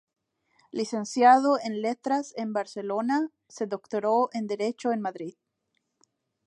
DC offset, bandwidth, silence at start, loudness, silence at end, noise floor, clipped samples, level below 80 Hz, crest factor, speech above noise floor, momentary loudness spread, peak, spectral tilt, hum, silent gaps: under 0.1%; 11 kHz; 0.75 s; -27 LUFS; 1.15 s; -78 dBFS; under 0.1%; -82 dBFS; 22 dB; 52 dB; 15 LU; -6 dBFS; -5 dB/octave; none; none